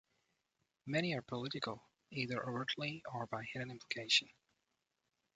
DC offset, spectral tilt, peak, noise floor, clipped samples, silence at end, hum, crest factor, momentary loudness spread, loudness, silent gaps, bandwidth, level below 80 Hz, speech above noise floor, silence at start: under 0.1%; -4 dB/octave; -18 dBFS; -86 dBFS; under 0.1%; 1.05 s; none; 26 dB; 13 LU; -39 LUFS; none; 9 kHz; -78 dBFS; 46 dB; 0.85 s